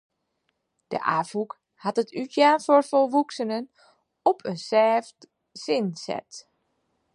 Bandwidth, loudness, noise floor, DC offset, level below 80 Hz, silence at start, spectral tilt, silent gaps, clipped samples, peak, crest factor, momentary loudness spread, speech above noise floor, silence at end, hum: 11.5 kHz; -24 LUFS; -76 dBFS; under 0.1%; -78 dBFS; 0.9 s; -5 dB/octave; none; under 0.1%; -6 dBFS; 20 dB; 14 LU; 52 dB; 0.75 s; none